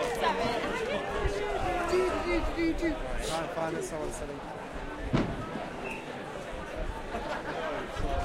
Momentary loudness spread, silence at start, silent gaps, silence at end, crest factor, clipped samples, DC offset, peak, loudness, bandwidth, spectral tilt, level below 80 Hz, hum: 10 LU; 0 s; none; 0 s; 18 dB; under 0.1%; under 0.1%; -14 dBFS; -33 LUFS; 16 kHz; -5 dB/octave; -40 dBFS; none